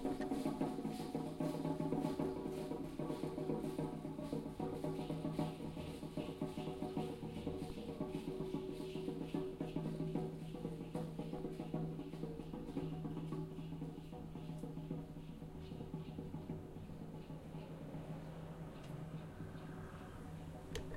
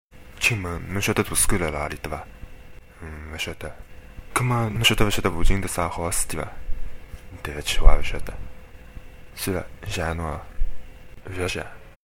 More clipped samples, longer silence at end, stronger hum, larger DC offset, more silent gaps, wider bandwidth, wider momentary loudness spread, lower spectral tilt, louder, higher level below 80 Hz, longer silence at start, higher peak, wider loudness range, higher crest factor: neither; second, 0 s vs 0.3 s; neither; neither; neither; about the same, 16 kHz vs 16.5 kHz; second, 9 LU vs 23 LU; first, -7.5 dB/octave vs -3.5 dB/octave; second, -45 LUFS vs -25 LUFS; second, -60 dBFS vs -28 dBFS; second, 0 s vs 0.15 s; second, -26 dBFS vs 0 dBFS; about the same, 7 LU vs 7 LU; about the same, 18 dB vs 22 dB